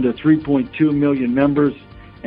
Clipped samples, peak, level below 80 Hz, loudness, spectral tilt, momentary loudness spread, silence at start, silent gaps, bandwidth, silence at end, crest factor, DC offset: under 0.1%; -2 dBFS; -46 dBFS; -17 LUFS; -11.5 dB/octave; 5 LU; 0 s; none; 4.5 kHz; 0 s; 14 dB; under 0.1%